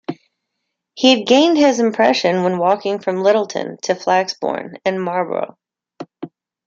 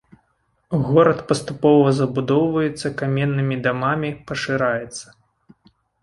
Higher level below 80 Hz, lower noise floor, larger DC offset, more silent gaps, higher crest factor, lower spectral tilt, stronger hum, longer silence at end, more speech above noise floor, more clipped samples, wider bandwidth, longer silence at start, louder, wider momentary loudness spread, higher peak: second, -68 dBFS vs -54 dBFS; first, -77 dBFS vs -67 dBFS; neither; neither; about the same, 16 dB vs 18 dB; second, -4.5 dB/octave vs -6.5 dB/octave; neither; second, 0.4 s vs 1 s; first, 61 dB vs 48 dB; neither; second, 7.8 kHz vs 11.5 kHz; second, 0.1 s vs 0.7 s; first, -16 LUFS vs -20 LUFS; first, 20 LU vs 11 LU; about the same, -2 dBFS vs -2 dBFS